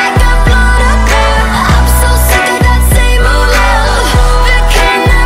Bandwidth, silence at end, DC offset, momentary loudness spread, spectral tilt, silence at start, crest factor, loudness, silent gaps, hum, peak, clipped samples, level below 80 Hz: 16 kHz; 0 s; under 0.1%; 1 LU; -4 dB/octave; 0 s; 6 dB; -8 LUFS; none; none; 0 dBFS; 0.2%; -8 dBFS